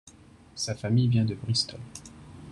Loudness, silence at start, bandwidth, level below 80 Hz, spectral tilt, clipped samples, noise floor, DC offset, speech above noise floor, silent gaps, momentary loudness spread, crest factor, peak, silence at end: -27 LUFS; 0.55 s; 11 kHz; -58 dBFS; -5.5 dB/octave; under 0.1%; -53 dBFS; under 0.1%; 26 dB; none; 22 LU; 16 dB; -12 dBFS; 0 s